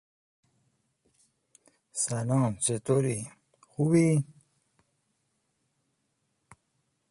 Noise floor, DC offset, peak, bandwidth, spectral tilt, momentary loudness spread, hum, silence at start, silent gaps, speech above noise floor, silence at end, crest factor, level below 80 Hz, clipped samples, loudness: -77 dBFS; under 0.1%; -12 dBFS; 11.5 kHz; -6 dB/octave; 17 LU; none; 1.95 s; none; 51 dB; 2.8 s; 20 dB; -68 dBFS; under 0.1%; -28 LUFS